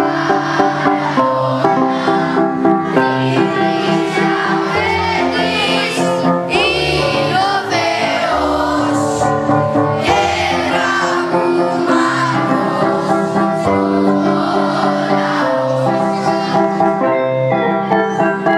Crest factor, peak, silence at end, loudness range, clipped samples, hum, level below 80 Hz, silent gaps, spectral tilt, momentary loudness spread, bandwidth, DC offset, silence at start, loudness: 14 dB; 0 dBFS; 0 s; 1 LU; under 0.1%; none; -44 dBFS; none; -5.5 dB/octave; 2 LU; 13.5 kHz; under 0.1%; 0 s; -14 LUFS